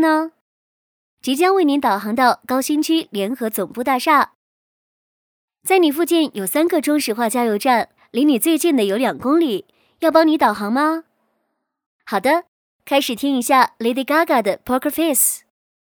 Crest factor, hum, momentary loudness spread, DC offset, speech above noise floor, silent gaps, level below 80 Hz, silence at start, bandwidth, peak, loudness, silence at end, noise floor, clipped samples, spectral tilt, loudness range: 18 dB; none; 8 LU; under 0.1%; 55 dB; 0.41-1.17 s, 4.35-5.48 s, 11.86-11.99 s, 12.48-12.79 s; -64 dBFS; 0 s; over 20 kHz; 0 dBFS; -18 LUFS; 0.45 s; -73 dBFS; under 0.1%; -3 dB/octave; 3 LU